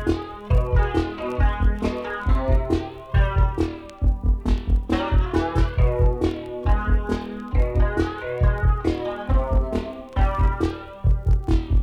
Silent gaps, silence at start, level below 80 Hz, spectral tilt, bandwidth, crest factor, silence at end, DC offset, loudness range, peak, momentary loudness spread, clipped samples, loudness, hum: none; 0 s; -22 dBFS; -8 dB/octave; 6.4 kHz; 14 dB; 0 s; under 0.1%; 1 LU; -8 dBFS; 6 LU; under 0.1%; -23 LUFS; none